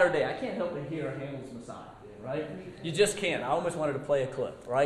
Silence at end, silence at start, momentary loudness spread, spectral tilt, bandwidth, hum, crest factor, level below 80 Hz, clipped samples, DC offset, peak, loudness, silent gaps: 0 s; 0 s; 17 LU; -4.5 dB/octave; 13 kHz; none; 20 dB; -62 dBFS; under 0.1%; under 0.1%; -12 dBFS; -31 LUFS; none